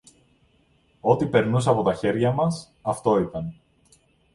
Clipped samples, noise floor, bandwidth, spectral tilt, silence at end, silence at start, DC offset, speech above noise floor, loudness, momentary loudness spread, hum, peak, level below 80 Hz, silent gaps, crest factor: under 0.1%; -62 dBFS; 11.5 kHz; -7 dB/octave; 0.8 s; 1.05 s; under 0.1%; 40 dB; -23 LUFS; 10 LU; none; -4 dBFS; -54 dBFS; none; 20 dB